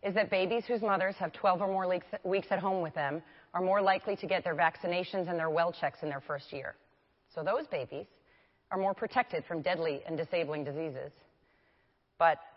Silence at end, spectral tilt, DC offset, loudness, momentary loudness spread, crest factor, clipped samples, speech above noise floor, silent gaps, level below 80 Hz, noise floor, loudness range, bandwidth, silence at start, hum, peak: 0.05 s; -9 dB/octave; under 0.1%; -33 LUFS; 11 LU; 20 dB; under 0.1%; 40 dB; none; -74 dBFS; -72 dBFS; 5 LU; 5.8 kHz; 0.05 s; none; -14 dBFS